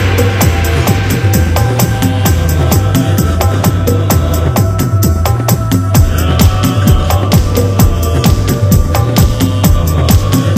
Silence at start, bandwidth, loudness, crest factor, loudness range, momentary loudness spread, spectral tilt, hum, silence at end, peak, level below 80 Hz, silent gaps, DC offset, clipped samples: 0 s; 16 kHz; -11 LUFS; 10 dB; 1 LU; 2 LU; -6 dB/octave; none; 0 s; 0 dBFS; -18 dBFS; none; under 0.1%; 0.3%